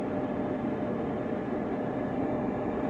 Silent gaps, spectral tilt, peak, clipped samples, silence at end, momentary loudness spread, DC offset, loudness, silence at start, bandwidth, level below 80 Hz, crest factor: none; -9 dB/octave; -18 dBFS; under 0.1%; 0 s; 2 LU; under 0.1%; -32 LUFS; 0 s; 7.4 kHz; -54 dBFS; 12 dB